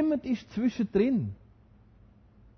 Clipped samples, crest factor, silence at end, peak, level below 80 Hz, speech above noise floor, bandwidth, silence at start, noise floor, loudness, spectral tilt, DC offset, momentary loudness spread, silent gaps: under 0.1%; 18 dB; 1.25 s; -14 dBFS; -56 dBFS; 30 dB; 6.4 kHz; 0 s; -58 dBFS; -29 LUFS; -8 dB/octave; under 0.1%; 11 LU; none